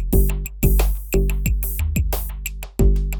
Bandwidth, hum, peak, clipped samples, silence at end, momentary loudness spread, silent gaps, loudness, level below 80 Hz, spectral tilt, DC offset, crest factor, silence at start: 19.5 kHz; none; -4 dBFS; under 0.1%; 0 s; 7 LU; none; -22 LUFS; -20 dBFS; -6 dB/octave; under 0.1%; 14 dB; 0 s